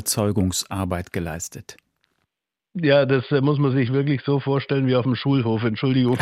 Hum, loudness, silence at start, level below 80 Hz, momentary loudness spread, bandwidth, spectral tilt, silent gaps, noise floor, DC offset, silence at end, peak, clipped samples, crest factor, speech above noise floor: none; -21 LUFS; 0 s; -52 dBFS; 10 LU; 15.5 kHz; -5.5 dB/octave; none; -81 dBFS; under 0.1%; 0 s; -4 dBFS; under 0.1%; 16 dB; 61 dB